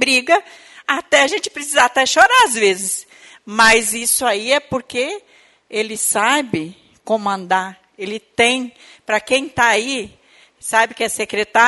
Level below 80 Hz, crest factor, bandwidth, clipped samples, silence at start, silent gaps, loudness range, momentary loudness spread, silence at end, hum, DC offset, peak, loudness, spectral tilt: -54 dBFS; 18 dB; 12 kHz; under 0.1%; 0 s; none; 6 LU; 16 LU; 0 s; none; under 0.1%; 0 dBFS; -16 LUFS; -1.5 dB/octave